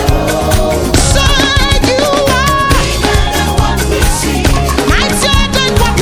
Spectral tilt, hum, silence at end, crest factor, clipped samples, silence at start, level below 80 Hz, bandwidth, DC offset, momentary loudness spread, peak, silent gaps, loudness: -4 dB/octave; none; 0 s; 10 dB; 0.5%; 0 s; -16 dBFS; 19.5 kHz; under 0.1%; 3 LU; 0 dBFS; none; -10 LUFS